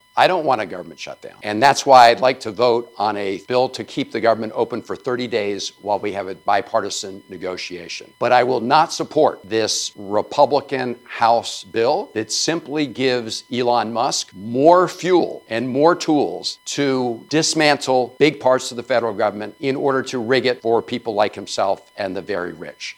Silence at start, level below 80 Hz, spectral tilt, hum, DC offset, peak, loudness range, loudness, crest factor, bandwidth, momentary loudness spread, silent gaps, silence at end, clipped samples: 0.15 s; -66 dBFS; -3.5 dB/octave; none; under 0.1%; 0 dBFS; 5 LU; -19 LUFS; 18 dB; 18 kHz; 11 LU; none; 0.05 s; under 0.1%